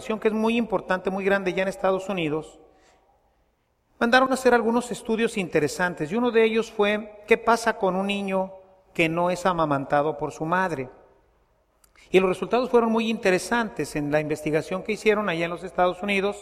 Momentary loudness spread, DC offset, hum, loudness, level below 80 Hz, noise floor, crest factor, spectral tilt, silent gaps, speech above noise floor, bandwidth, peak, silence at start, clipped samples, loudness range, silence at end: 8 LU; under 0.1%; none; -24 LUFS; -56 dBFS; -68 dBFS; 20 dB; -5 dB/octave; none; 45 dB; 15 kHz; -4 dBFS; 0 s; under 0.1%; 3 LU; 0 s